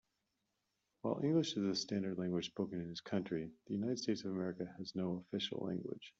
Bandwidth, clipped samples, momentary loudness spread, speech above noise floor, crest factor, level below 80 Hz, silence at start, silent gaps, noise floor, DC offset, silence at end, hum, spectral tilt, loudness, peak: 7.8 kHz; under 0.1%; 9 LU; 46 dB; 18 dB; -78 dBFS; 1.05 s; none; -86 dBFS; under 0.1%; 0.1 s; none; -5.5 dB/octave; -40 LUFS; -22 dBFS